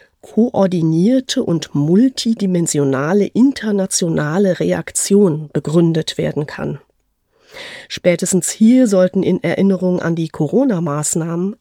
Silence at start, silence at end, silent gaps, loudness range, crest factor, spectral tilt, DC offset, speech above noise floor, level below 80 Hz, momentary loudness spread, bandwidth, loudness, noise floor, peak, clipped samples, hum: 0.25 s; 0.05 s; none; 3 LU; 14 dB; -5.5 dB/octave; under 0.1%; 48 dB; -56 dBFS; 8 LU; 16.5 kHz; -16 LUFS; -63 dBFS; 0 dBFS; under 0.1%; none